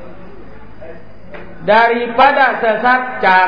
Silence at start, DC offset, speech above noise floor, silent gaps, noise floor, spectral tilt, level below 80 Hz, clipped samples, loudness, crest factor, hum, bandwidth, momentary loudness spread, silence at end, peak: 0 s; 3%; 25 dB; none; -37 dBFS; -6 dB/octave; -46 dBFS; under 0.1%; -12 LUFS; 14 dB; none; 5.2 kHz; 6 LU; 0 s; 0 dBFS